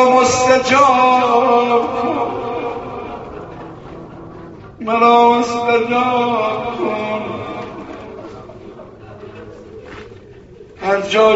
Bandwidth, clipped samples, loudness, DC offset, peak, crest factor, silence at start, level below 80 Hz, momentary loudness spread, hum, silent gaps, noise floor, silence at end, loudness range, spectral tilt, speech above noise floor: 8 kHz; under 0.1%; -15 LUFS; under 0.1%; 0 dBFS; 16 dB; 0 s; -48 dBFS; 24 LU; none; none; -39 dBFS; 0 s; 15 LU; -2.5 dB/octave; 25 dB